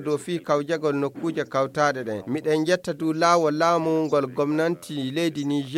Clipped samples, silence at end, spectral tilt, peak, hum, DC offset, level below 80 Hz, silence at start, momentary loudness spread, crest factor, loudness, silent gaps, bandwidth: under 0.1%; 0 s; -5.5 dB/octave; -6 dBFS; none; under 0.1%; -70 dBFS; 0 s; 8 LU; 18 dB; -24 LUFS; none; 15.5 kHz